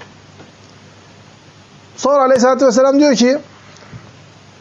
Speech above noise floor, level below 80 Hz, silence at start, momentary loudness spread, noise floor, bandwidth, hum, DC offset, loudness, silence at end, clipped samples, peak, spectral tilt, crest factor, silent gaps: 31 dB; -62 dBFS; 2 s; 6 LU; -43 dBFS; 8 kHz; none; under 0.1%; -12 LUFS; 0.65 s; under 0.1%; -4 dBFS; -4 dB/octave; 12 dB; none